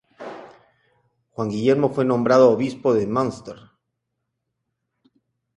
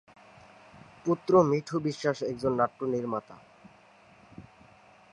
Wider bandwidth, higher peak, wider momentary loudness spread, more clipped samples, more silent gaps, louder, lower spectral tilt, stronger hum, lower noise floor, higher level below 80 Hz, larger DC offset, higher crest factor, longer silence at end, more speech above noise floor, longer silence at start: about the same, 10.5 kHz vs 11 kHz; first, -2 dBFS vs -8 dBFS; first, 23 LU vs 11 LU; neither; neither; first, -20 LUFS vs -28 LUFS; about the same, -7 dB/octave vs -7 dB/octave; neither; first, -78 dBFS vs -57 dBFS; about the same, -62 dBFS vs -66 dBFS; neither; about the same, 20 dB vs 22 dB; first, 2 s vs 0.7 s; first, 59 dB vs 30 dB; second, 0.2 s vs 1.05 s